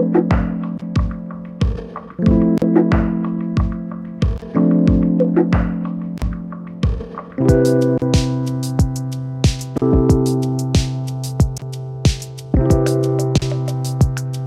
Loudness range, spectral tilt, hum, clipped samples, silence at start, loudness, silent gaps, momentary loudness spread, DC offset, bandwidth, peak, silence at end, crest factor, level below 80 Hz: 2 LU; -7 dB/octave; none; under 0.1%; 0 s; -18 LUFS; none; 11 LU; under 0.1%; 14 kHz; 0 dBFS; 0 s; 16 dB; -26 dBFS